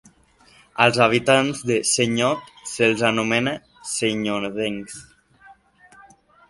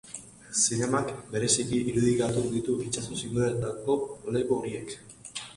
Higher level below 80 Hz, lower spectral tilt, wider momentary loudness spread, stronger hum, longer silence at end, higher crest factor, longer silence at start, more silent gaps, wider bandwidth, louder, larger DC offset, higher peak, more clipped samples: about the same, -58 dBFS vs -56 dBFS; about the same, -3.5 dB/octave vs -4.5 dB/octave; about the same, 16 LU vs 14 LU; neither; first, 0.95 s vs 0 s; about the same, 22 dB vs 18 dB; first, 0.75 s vs 0.05 s; neither; about the same, 11.5 kHz vs 11.5 kHz; first, -20 LUFS vs -28 LUFS; neither; first, 0 dBFS vs -10 dBFS; neither